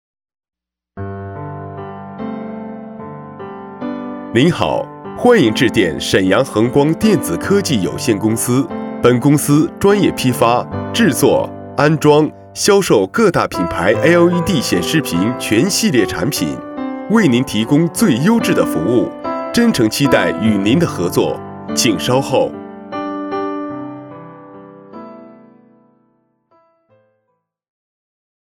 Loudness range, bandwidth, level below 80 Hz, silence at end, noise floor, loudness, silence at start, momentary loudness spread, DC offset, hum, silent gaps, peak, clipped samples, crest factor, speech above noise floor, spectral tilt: 13 LU; 19 kHz; -46 dBFS; 3.25 s; -69 dBFS; -14 LUFS; 0.95 s; 17 LU; under 0.1%; none; none; 0 dBFS; under 0.1%; 16 dB; 56 dB; -5 dB/octave